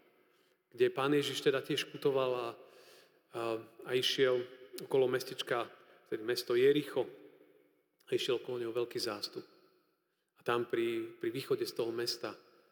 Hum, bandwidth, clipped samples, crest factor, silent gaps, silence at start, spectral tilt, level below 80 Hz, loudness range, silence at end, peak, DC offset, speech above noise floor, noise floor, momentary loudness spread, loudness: none; over 20 kHz; under 0.1%; 18 dB; none; 0.75 s; -4.5 dB/octave; under -90 dBFS; 5 LU; 0.35 s; -18 dBFS; under 0.1%; 46 dB; -80 dBFS; 13 LU; -35 LUFS